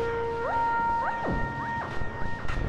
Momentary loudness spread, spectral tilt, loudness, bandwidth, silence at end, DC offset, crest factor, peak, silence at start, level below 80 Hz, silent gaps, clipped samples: 9 LU; -7 dB/octave; -29 LUFS; 9 kHz; 0 s; under 0.1%; 12 dB; -16 dBFS; 0 s; -38 dBFS; none; under 0.1%